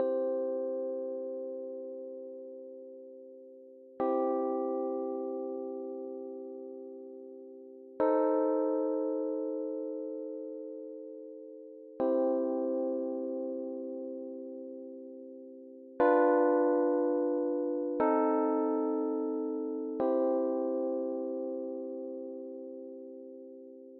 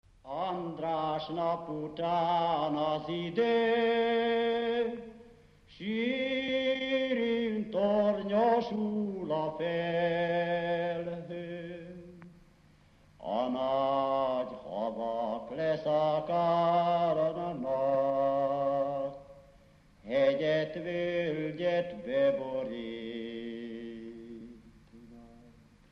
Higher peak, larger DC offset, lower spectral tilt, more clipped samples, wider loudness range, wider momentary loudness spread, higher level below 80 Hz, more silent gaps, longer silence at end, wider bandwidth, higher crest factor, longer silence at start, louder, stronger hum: about the same, -14 dBFS vs -16 dBFS; neither; about the same, -6 dB/octave vs -7 dB/octave; neither; first, 9 LU vs 6 LU; first, 20 LU vs 13 LU; second, -82 dBFS vs -64 dBFS; neither; second, 0 s vs 0.45 s; second, 3.9 kHz vs 6.6 kHz; about the same, 18 dB vs 16 dB; second, 0 s vs 0.25 s; about the same, -33 LUFS vs -31 LUFS; neither